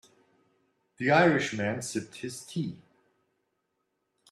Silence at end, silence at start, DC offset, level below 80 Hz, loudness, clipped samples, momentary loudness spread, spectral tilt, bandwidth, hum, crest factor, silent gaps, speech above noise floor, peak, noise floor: 1.55 s; 1 s; under 0.1%; -70 dBFS; -28 LUFS; under 0.1%; 16 LU; -5 dB/octave; 13.5 kHz; none; 24 dB; none; 52 dB; -8 dBFS; -79 dBFS